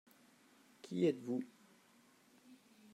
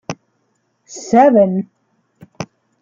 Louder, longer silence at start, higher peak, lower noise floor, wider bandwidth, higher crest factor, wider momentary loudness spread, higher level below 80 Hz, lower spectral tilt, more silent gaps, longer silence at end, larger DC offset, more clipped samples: second, -39 LUFS vs -13 LUFS; first, 0.85 s vs 0.1 s; second, -22 dBFS vs -2 dBFS; first, -69 dBFS vs -65 dBFS; first, 14.5 kHz vs 7.6 kHz; first, 22 dB vs 16 dB; about the same, 24 LU vs 23 LU; second, under -90 dBFS vs -60 dBFS; about the same, -7 dB/octave vs -6.5 dB/octave; neither; about the same, 0.4 s vs 0.35 s; neither; neither